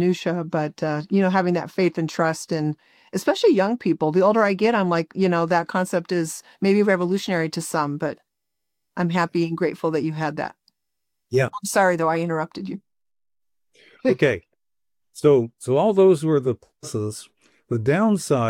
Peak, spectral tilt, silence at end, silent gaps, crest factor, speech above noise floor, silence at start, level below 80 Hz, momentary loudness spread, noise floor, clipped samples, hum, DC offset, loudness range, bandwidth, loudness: -4 dBFS; -6 dB/octave; 0 s; none; 18 dB; over 69 dB; 0 s; -64 dBFS; 12 LU; under -90 dBFS; under 0.1%; none; under 0.1%; 5 LU; 16.5 kHz; -22 LUFS